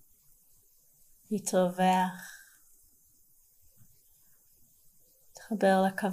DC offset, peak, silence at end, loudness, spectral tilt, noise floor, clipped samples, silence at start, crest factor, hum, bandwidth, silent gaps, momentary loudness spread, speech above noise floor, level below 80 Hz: under 0.1%; -14 dBFS; 0 s; -28 LUFS; -5.5 dB/octave; -64 dBFS; under 0.1%; 1.3 s; 18 dB; none; 15.5 kHz; none; 22 LU; 37 dB; -72 dBFS